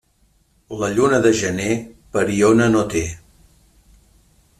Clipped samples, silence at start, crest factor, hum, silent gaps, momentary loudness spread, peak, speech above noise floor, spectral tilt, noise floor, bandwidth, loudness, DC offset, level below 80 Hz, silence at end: under 0.1%; 0.7 s; 18 dB; none; none; 12 LU; -2 dBFS; 43 dB; -5 dB/octave; -60 dBFS; 13.5 kHz; -18 LUFS; under 0.1%; -46 dBFS; 1.45 s